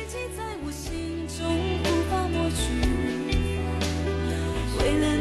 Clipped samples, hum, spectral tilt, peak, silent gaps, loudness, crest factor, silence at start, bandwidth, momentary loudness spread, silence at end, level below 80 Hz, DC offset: under 0.1%; none; -5.5 dB/octave; -12 dBFS; none; -27 LUFS; 14 dB; 0 s; 12.5 kHz; 8 LU; 0 s; -32 dBFS; under 0.1%